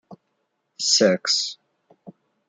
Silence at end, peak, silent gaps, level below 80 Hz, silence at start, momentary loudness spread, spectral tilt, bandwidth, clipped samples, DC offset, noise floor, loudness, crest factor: 0.4 s; -4 dBFS; none; -76 dBFS; 0.1 s; 9 LU; -2 dB/octave; 10 kHz; under 0.1%; under 0.1%; -74 dBFS; -20 LUFS; 20 dB